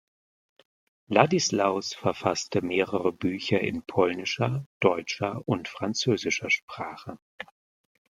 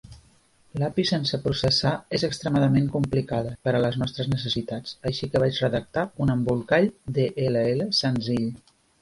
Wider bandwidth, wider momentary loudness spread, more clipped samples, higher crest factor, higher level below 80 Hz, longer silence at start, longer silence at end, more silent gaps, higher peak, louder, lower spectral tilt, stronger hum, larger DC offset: first, 14 kHz vs 11.5 kHz; first, 14 LU vs 7 LU; neither; first, 26 dB vs 16 dB; second, -66 dBFS vs -50 dBFS; first, 1.1 s vs 0.1 s; first, 0.7 s vs 0.45 s; first, 4.66-4.80 s, 6.63-6.68 s, 7.22-7.38 s vs none; first, -2 dBFS vs -8 dBFS; about the same, -27 LUFS vs -25 LUFS; second, -4.5 dB/octave vs -6 dB/octave; neither; neither